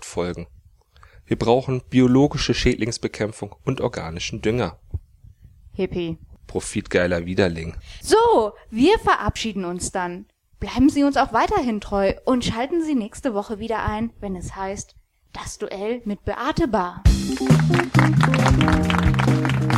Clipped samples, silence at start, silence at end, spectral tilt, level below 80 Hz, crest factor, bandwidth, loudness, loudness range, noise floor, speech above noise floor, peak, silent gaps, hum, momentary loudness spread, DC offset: under 0.1%; 0 s; 0 s; -6 dB/octave; -34 dBFS; 18 dB; 14 kHz; -21 LUFS; 8 LU; -51 dBFS; 31 dB; -2 dBFS; none; none; 14 LU; under 0.1%